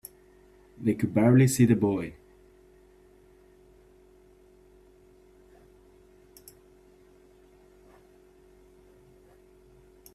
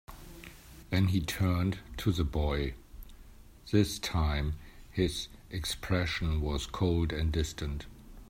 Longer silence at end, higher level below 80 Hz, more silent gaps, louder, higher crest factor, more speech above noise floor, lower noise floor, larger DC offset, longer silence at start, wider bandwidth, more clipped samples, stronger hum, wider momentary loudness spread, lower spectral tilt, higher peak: first, 8 s vs 0.05 s; second, -60 dBFS vs -40 dBFS; neither; first, -24 LUFS vs -32 LUFS; about the same, 22 dB vs 18 dB; first, 35 dB vs 22 dB; first, -57 dBFS vs -52 dBFS; neither; first, 0.8 s vs 0.1 s; second, 14.5 kHz vs 16 kHz; neither; neither; first, 29 LU vs 20 LU; first, -7 dB/octave vs -5.5 dB/octave; first, -10 dBFS vs -14 dBFS